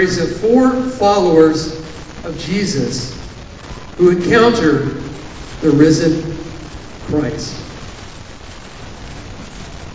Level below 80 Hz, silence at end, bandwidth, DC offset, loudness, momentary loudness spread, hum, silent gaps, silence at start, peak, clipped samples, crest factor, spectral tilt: -36 dBFS; 0 s; 8 kHz; under 0.1%; -14 LUFS; 22 LU; none; none; 0 s; 0 dBFS; under 0.1%; 16 dB; -5.5 dB/octave